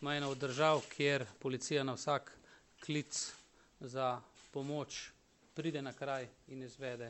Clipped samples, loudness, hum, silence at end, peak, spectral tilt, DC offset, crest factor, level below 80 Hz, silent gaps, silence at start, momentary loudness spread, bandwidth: under 0.1%; -39 LUFS; none; 0 s; -18 dBFS; -4 dB/octave; under 0.1%; 22 dB; -76 dBFS; none; 0 s; 17 LU; 8.6 kHz